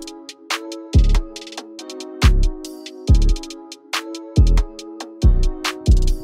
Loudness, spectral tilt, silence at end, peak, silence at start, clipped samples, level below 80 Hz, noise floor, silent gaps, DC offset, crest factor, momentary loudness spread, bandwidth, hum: -20 LUFS; -5.5 dB/octave; 0 s; -2 dBFS; 0 s; under 0.1%; -18 dBFS; -36 dBFS; none; under 0.1%; 16 dB; 16 LU; 14 kHz; none